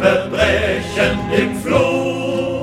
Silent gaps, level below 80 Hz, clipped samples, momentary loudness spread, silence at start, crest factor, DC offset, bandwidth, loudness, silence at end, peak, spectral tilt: none; -34 dBFS; under 0.1%; 4 LU; 0 s; 16 dB; under 0.1%; 15.5 kHz; -17 LUFS; 0 s; 0 dBFS; -5.5 dB/octave